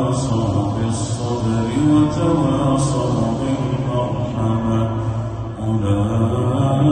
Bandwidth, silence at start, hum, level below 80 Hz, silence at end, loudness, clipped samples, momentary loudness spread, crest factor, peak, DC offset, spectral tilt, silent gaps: 9.4 kHz; 0 s; none; -36 dBFS; 0 s; -19 LUFS; under 0.1%; 6 LU; 14 dB; -4 dBFS; under 0.1%; -7.5 dB/octave; none